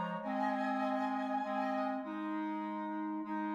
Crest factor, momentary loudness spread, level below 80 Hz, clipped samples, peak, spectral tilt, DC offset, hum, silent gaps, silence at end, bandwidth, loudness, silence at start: 14 dB; 5 LU; -84 dBFS; under 0.1%; -24 dBFS; -7 dB/octave; under 0.1%; none; none; 0 s; 7.6 kHz; -37 LUFS; 0 s